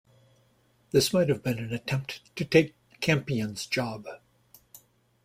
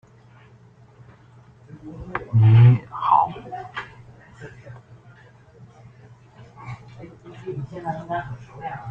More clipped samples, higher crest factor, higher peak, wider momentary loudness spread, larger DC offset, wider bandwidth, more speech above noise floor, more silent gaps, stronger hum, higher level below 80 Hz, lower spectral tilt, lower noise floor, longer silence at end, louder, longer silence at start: neither; about the same, 22 dB vs 20 dB; about the same, -6 dBFS vs -4 dBFS; second, 12 LU vs 28 LU; neither; first, 16 kHz vs 3.9 kHz; first, 39 dB vs 31 dB; neither; neither; second, -60 dBFS vs -54 dBFS; second, -5 dB/octave vs -9 dB/octave; first, -66 dBFS vs -50 dBFS; first, 1.1 s vs 0 s; second, -28 LUFS vs -20 LUFS; second, 0.95 s vs 1.75 s